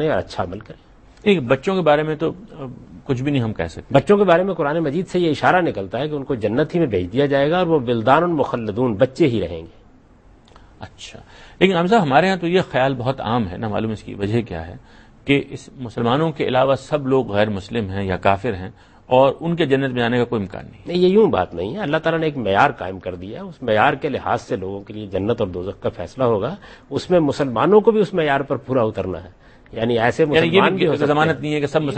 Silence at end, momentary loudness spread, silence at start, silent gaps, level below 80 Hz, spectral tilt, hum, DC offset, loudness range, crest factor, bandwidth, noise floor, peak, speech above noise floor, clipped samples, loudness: 0 s; 15 LU; 0 s; none; -48 dBFS; -7 dB/octave; none; under 0.1%; 4 LU; 20 dB; 8.8 kHz; -49 dBFS; 0 dBFS; 30 dB; under 0.1%; -19 LUFS